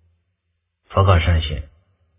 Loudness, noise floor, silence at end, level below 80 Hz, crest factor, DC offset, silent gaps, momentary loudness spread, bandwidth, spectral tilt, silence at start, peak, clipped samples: -18 LUFS; -73 dBFS; 0.55 s; -26 dBFS; 20 dB; under 0.1%; none; 12 LU; 3.8 kHz; -10.5 dB/octave; 0.9 s; 0 dBFS; under 0.1%